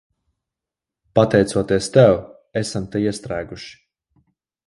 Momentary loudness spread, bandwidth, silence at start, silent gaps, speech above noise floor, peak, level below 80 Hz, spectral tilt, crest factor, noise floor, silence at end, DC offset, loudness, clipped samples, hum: 15 LU; 11.5 kHz; 1.15 s; none; 69 dB; 0 dBFS; -48 dBFS; -6 dB/octave; 20 dB; -87 dBFS; 0.95 s; under 0.1%; -19 LUFS; under 0.1%; none